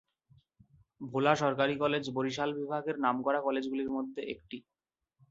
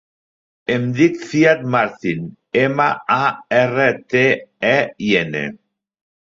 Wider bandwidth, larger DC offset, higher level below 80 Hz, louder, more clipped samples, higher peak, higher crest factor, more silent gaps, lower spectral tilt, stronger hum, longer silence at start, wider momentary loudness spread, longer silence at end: about the same, 7.8 kHz vs 7.6 kHz; neither; second, -70 dBFS vs -58 dBFS; second, -32 LUFS vs -17 LUFS; neither; second, -10 dBFS vs -2 dBFS; first, 22 dB vs 16 dB; neither; about the same, -5.5 dB/octave vs -6 dB/octave; neither; first, 1 s vs 0.7 s; first, 13 LU vs 9 LU; about the same, 0.7 s vs 0.75 s